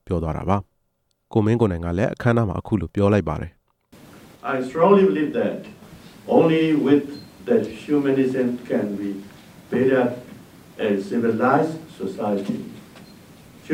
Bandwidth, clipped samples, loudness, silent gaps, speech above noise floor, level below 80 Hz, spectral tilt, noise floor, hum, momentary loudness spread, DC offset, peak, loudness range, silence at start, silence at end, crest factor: 16 kHz; under 0.1%; -21 LUFS; none; 50 dB; -46 dBFS; -8 dB/octave; -70 dBFS; none; 14 LU; under 0.1%; -2 dBFS; 4 LU; 0.1 s; 0 s; 18 dB